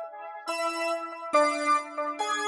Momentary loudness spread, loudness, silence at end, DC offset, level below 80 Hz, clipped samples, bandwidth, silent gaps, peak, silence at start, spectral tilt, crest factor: 10 LU; -28 LUFS; 0 s; under 0.1%; -88 dBFS; under 0.1%; 11.5 kHz; none; -10 dBFS; 0 s; 0 dB/octave; 18 dB